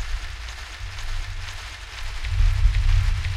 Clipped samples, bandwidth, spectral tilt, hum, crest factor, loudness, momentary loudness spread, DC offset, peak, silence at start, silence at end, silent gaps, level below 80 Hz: under 0.1%; 11 kHz; -3.5 dB/octave; none; 16 dB; -28 LUFS; 13 LU; under 0.1%; -6 dBFS; 0 s; 0 s; none; -24 dBFS